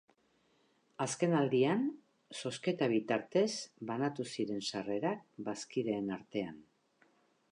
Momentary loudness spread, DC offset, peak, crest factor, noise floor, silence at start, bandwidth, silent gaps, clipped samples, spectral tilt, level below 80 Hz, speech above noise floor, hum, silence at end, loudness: 11 LU; under 0.1%; -18 dBFS; 18 dB; -73 dBFS; 1 s; 11 kHz; none; under 0.1%; -5 dB/octave; -80 dBFS; 38 dB; none; 0.9 s; -36 LUFS